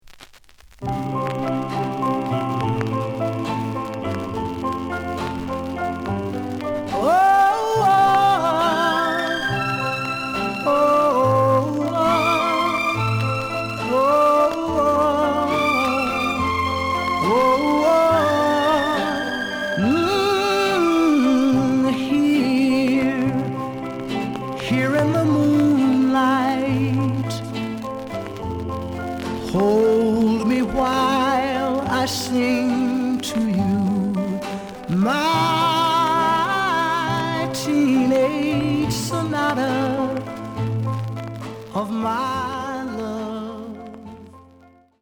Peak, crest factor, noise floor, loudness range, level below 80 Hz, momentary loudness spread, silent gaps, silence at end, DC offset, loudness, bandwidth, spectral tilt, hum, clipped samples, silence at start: -6 dBFS; 14 dB; -51 dBFS; 7 LU; -48 dBFS; 11 LU; none; 0.6 s; under 0.1%; -20 LUFS; over 20 kHz; -5.5 dB/octave; none; under 0.1%; 0.1 s